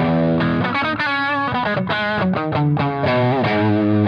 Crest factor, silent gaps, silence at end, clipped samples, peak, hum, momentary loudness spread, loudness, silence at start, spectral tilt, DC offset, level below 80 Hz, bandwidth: 12 dB; none; 0 s; under 0.1%; -6 dBFS; none; 3 LU; -18 LUFS; 0 s; -8.5 dB/octave; under 0.1%; -50 dBFS; 6.6 kHz